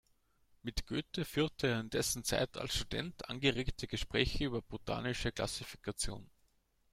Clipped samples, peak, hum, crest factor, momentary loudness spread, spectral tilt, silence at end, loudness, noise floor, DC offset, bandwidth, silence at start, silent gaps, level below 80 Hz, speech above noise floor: under 0.1%; -12 dBFS; none; 26 dB; 8 LU; -4 dB/octave; 0.65 s; -37 LUFS; -74 dBFS; under 0.1%; 16.5 kHz; 0.65 s; none; -50 dBFS; 37 dB